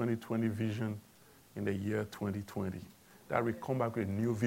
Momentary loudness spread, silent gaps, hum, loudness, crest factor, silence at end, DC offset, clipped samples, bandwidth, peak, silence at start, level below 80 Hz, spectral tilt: 9 LU; none; none; -36 LUFS; 22 dB; 0 s; under 0.1%; under 0.1%; 16.5 kHz; -14 dBFS; 0 s; -70 dBFS; -7.5 dB/octave